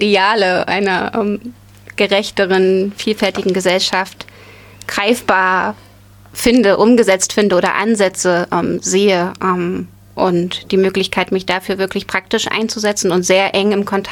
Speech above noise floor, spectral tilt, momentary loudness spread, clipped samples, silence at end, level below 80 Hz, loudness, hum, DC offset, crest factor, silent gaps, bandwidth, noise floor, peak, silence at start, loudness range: 25 dB; -4 dB/octave; 10 LU; under 0.1%; 0 s; -48 dBFS; -15 LUFS; 50 Hz at -45 dBFS; under 0.1%; 14 dB; none; 19 kHz; -40 dBFS; 0 dBFS; 0 s; 3 LU